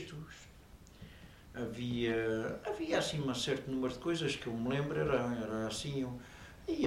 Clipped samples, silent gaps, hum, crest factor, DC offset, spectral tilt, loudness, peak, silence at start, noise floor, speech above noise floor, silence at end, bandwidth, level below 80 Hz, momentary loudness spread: under 0.1%; none; none; 18 dB; under 0.1%; -5 dB/octave; -36 LUFS; -18 dBFS; 0 s; -57 dBFS; 21 dB; 0 s; 16 kHz; -58 dBFS; 20 LU